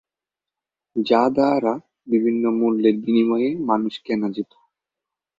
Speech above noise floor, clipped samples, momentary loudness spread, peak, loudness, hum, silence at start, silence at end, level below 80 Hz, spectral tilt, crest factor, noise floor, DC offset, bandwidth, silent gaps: 69 dB; under 0.1%; 10 LU; -4 dBFS; -20 LUFS; none; 0.95 s; 0.95 s; -66 dBFS; -7.5 dB/octave; 18 dB; -88 dBFS; under 0.1%; 7.4 kHz; none